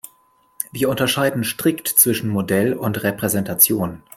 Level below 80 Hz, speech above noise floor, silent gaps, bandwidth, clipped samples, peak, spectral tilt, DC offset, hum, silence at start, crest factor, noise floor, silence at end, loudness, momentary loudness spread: -56 dBFS; 39 dB; none; 16.5 kHz; under 0.1%; 0 dBFS; -3.5 dB/octave; under 0.1%; none; 0.6 s; 20 dB; -58 dBFS; 0.2 s; -18 LUFS; 8 LU